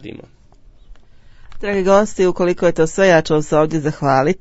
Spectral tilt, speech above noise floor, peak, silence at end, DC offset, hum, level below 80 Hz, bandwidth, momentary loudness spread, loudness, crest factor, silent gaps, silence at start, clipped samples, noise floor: -6 dB/octave; 31 dB; 0 dBFS; 0.05 s; under 0.1%; none; -40 dBFS; 8 kHz; 7 LU; -15 LUFS; 16 dB; none; 0.05 s; under 0.1%; -45 dBFS